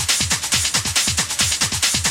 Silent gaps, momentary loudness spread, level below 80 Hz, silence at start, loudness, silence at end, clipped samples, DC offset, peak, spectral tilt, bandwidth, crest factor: none; 1 LU; -38 dBFS; 0 s; -17 LUFS; 0 s; under 0.1%; under 0.1%; -4 dBFS; -0.5 dB/octave; 16.5 kHz; 14 dB